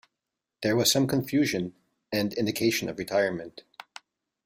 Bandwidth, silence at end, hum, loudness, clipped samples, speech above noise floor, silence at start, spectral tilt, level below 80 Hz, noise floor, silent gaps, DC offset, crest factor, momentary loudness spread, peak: 16 kHz; 0.85 s; none; -26 LUFS; under 0.1%; 60 dB; 0.6 s; -4 dB/octave; -64 dBFS; -86 dBFS; none; under 0.1%; 18 dB; 22 LU; -10 dBFS